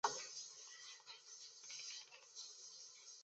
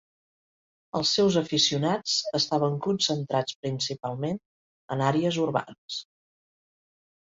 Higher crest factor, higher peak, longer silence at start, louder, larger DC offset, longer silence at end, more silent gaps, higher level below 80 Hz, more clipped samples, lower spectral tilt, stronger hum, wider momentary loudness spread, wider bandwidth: first, 30 dB vs 18 dB; second, -22 dBFS vs -10 dBFS; second, 0.05 s vs 0.95 s; second, -52 LUFS vs -26 LUFS; neither; second, 0 s vs 1.2 s; second, none vs 3.55-3.63 s, 4.45-4.88 s, 5.78-5.88 s; second, under -90 dBFS vs -66 dBFS; neither; second, 1.5 dB/octave vs -4.5 dB/octave; neither; second, 8 LU vs 12 LU; about the same, 8.2 kHz vs 8 kHz